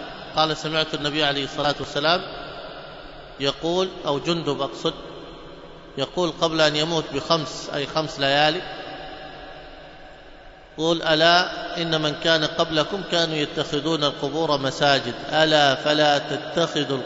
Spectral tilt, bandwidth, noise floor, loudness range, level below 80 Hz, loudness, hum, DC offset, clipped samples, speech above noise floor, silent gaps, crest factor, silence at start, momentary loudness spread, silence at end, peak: -4 dB/octave; 8 kHz; -44 dBFS; 6 LU; -50 dBFS; -22 LUFS; none; under 0.1%; under 0.1%; 22 dB; none; 20 dB; 0 s; 20 LU; 0 s; -2 dBFS